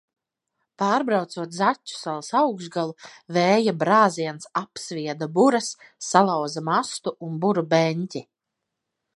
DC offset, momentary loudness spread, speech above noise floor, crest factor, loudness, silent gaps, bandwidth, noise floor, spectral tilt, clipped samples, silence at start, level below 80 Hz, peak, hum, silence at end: under 0.1%; 12 LU; 60 dB; 22 dB; -23 LUFS; none; 11.5 kHz; -83 dBFS; -5 dB/octave; under 0.1%; 0.8 s; -74 dBFS; 0 dBFS; none; 0.95 s